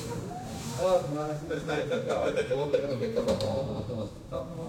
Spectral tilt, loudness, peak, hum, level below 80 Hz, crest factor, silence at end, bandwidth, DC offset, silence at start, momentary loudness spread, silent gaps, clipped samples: -6 dB/octave; -31 LUFS; -14 dBFS; none; -52 dBFS; 18 dB; 0 s; 16.5 kHz; under 0.1%; 0 s; 10 LU; none; under 0.1%